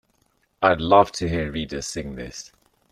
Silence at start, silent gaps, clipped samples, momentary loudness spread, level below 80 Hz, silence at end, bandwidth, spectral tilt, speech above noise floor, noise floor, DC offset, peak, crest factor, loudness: 0.6 s; none; under 0.1%; 18 LU; -44 dBFS; 0.45 s; 13.5 kHz; -5 dB/octave; 45 dB; -67 dBFS; under 0.1%; -2 dBFS; 22 dB; -21 LUFS